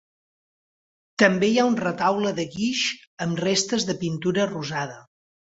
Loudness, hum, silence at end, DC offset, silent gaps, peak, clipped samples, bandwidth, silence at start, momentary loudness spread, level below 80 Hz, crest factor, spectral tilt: -23 LUFS; none; 0.55 s; under 0.1%; 3.07-3.17 s; -2 dBFS; under 0.1%; 8 kHz; 1.2 s; 9 LU; -62 dBFS; 22 dB; -4 dB/octave